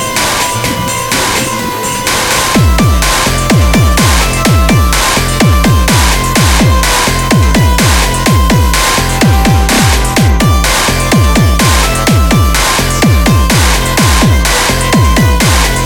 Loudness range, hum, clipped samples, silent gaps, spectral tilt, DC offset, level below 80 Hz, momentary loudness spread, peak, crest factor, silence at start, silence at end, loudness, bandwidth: 1 LU; none; under 0.1%; none; -4 dB/octave; under 0.1%; -14 dBFS; 3 LU; 0 dBFS; 8 dB; 0 s; 0 s; -8 LUFS; 19.5 kHz